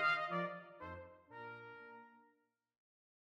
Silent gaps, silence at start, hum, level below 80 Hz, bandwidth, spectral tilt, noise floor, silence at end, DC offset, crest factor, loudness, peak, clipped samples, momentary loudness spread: none; 0 s; none; -78 dBFS; 13.5 kHz; -5.5 dB/octave; -80 dBFS; 1.1 s; under 0.1%; 20 dB; -44 LUFS; -24 dBFS; under 0.1%; 20 LU